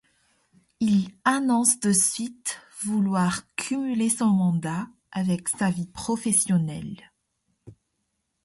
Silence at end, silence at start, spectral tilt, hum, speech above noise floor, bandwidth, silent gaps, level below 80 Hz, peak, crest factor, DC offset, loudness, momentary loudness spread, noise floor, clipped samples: 0.7 s; 0.8 s; -4.5 dB/octave; none; 53 dB; 12 kHz; none; -60 dBFS; -6 dBFS; 20 dB; under 0.1%; -24 LUFS; 12 LU; -77 dBFS; under 0.1%